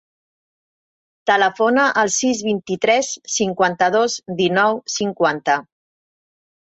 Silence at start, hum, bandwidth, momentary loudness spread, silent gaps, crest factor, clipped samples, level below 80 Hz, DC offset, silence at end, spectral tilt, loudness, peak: 1.25 s; none; 8.2 kHz; 6 LU; none; 18 dB; under 0.1%; -64 dBFS; under 0.1%; 1.05 s; -3 dB/octave; -18 LUFS; -2 dBFS